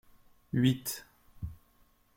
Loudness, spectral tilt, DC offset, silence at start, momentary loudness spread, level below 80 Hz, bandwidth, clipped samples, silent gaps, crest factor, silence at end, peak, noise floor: -32 LUFS; -5.5 dB/octave; under 0.1%; 0.55 s; 17 LU; -56 dBFS; 16.5 kHz; under 0.1%; none; 22 dB; 0.6 s; -14 dBFS; -66 dBFS